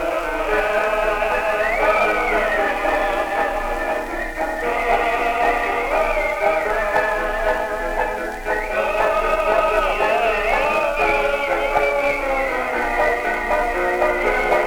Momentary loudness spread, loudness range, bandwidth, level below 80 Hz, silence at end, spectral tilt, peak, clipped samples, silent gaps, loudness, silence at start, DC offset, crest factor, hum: 5 LU; 2 LU; 20 kHz; -34 dBFS; 0 s; -4 dB/octave; -4 dBFS; under 0.1%; none; -19 LUFS; 0 s; under 0.1%; 14 dB; none